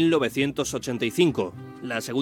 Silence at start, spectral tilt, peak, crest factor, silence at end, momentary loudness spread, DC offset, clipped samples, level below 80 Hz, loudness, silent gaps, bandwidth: 0 s; -5 dB/octave; -8 dBFS; 16 dB; 0 s; 9 LU; under 0.1%; under 0.1%; -58 dBFS; -25 LUFS; none; 17.5 kHz